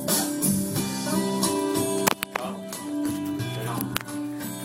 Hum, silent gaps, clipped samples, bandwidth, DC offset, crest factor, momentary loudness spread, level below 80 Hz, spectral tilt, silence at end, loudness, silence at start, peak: none; none; under 0.1%; 16.5 kHz; under 0.1%; 26 dB; 8 LU; -58 dBFS; -4 dB/octave; 0 s; -26 LUFS; 0 s; 0 dBFS